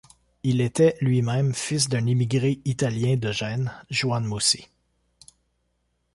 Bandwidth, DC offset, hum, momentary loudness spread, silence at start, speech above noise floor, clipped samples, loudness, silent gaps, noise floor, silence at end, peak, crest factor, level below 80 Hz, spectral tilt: 11.5 kHz; under 0.1%; none; 6 LU; 0.45 s; 49 dB; under 0.1%; -24 LUFS; none; -72 dBFS; 1.5 s; -8 dBFS; 16 dB; -56 dBFS; -5 dB/octave